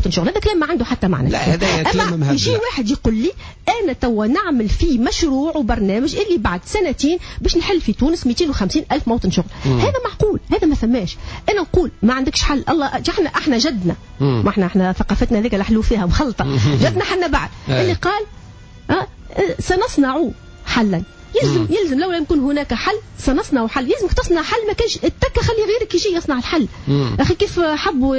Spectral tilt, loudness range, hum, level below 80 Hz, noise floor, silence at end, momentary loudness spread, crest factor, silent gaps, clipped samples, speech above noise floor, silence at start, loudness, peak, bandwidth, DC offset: -5.5 dB/octave; 2 LU; none; -28 dBFS; -38 dBFS; 0 s; 4 LU; 14 dB; none; under 0.1%; 21 dB; 0 s; -18 LUFS; -4 dBFS; 8 kHz; under 0.1%